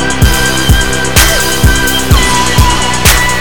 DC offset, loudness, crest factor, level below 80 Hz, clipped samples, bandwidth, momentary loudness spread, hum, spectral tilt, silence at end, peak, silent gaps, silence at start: 10%; -8 LUFS; 10 dB; -14 dBFS; 1%; over 20 kHz; 2 LU; none; -3 dB/octave; 0 s; 0 dBFS; none; 0 s